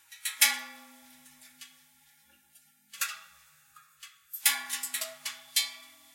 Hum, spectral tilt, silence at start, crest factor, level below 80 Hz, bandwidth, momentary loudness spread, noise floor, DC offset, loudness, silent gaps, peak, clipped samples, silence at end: none; 4 dB/octave; 0.1 s; 32 dB; -88 dBFS; 16.5 kHz; 26 LU; -64 dBFS; under 0.1%; -29 LUFS; none; -4 dBFS; under 0.1%; 0.25 s